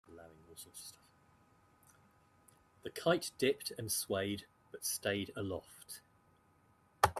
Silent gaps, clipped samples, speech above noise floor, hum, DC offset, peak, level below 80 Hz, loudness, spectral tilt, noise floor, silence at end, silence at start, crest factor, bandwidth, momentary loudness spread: none; under 0.1%; 31 dB; none; under 0.1%; -12 dBFS; -68 dBFS; -38 LUFS; -3.5 dB/octave; -70 dBFS; 0 s; 0.1 s; 28 dB; 15.5 kHz; 19 LU